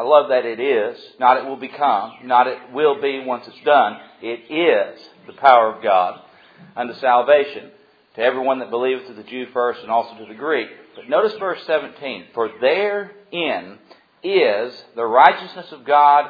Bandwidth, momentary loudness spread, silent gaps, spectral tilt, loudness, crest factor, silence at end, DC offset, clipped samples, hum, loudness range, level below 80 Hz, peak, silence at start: 5.4 kHz; 16 LU; none; -6.5 dB/octave; -18 LUFS; 18 dB; 0 s; under 0.1%; under 0.1%; none; 5 LU; -72 dBFS; 0 dBFS; 0 s